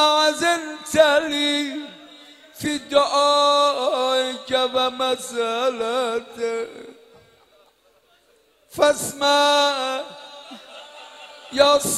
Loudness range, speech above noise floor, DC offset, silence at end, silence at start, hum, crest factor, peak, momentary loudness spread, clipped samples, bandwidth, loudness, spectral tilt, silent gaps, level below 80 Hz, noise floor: 7 LU; 39 dB; under 0.1%; 0 s; 0 s; none; 20 dB; -2 dBFS; 23 LU; under 0.1%; 15 kHz; -20 LUFS; -1.5 dB/octave; none; -62 dBFS; -59 dBFS